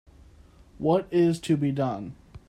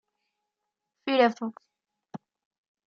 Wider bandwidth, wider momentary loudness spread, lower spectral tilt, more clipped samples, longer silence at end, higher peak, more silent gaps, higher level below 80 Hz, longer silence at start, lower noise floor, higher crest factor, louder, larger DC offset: first, 12.5 kHz vs 7.2 kHz; second, 10 LU vs 23 LU; first, -7.5 dB/octave vs -2.5 dB/octave; neither; second, 0.1 s vs 0.7 s; about the same, -10 dBFS vs -8 dBFS; neither; first, -56 dBFS vs -86 dBFS; second, 0.8 s vs 1.05 s; second, -53 dBFS vs -85 dBFS; second, 18 dB vs 24 dB; about the same, -26 LUFS vs -26 LUFS; neither